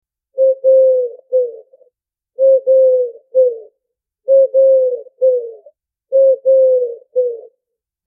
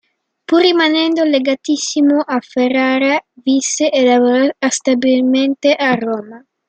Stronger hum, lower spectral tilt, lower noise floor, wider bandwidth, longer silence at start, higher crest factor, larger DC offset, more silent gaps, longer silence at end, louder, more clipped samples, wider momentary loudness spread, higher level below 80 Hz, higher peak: neither; first, -8.5 dB/octave vs -2.5 dB/octave; first, -79 dBFS vs -36 dBFS; second, 0.9 kHz vs 9 kHz; second, 0.35 s vs 0.5 s; about the same, 10 dB vs 14 dB; neither; neither; first, 0.65 s vs 0.3 s; about the same, -14 LUFS vs -14 LUFS; neither; first, 11 LU vs 6 LU; second, -82 dBFS vs -66 dBFS; second, -4 dBFS vs 0 dBFS